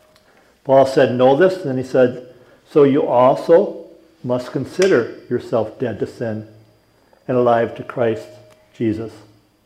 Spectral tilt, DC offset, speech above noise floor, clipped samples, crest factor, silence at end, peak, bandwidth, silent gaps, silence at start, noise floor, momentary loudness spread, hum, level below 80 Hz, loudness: -7 dB/octave; under 0.1%; 38 dB; under 0.1%; 16 dB; 0.5 s; -2 dBFS; 12 kHz; none; 0.65 s; -55 dBFS; 14 LU; none; -62 dBFS; -17 LUFS